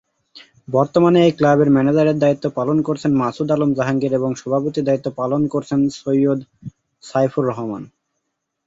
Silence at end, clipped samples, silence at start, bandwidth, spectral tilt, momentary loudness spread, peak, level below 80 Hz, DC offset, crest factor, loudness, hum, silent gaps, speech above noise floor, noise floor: 0.8 s; under 0.1%; 0.35 s; 7.8 kHz; -7.5 dB/octave; 8 LU; -2 dBFS; -56 dBFS; under 0.1%; 16 dB; -18 LUFS; none; none; 58 dB; -75 dBFS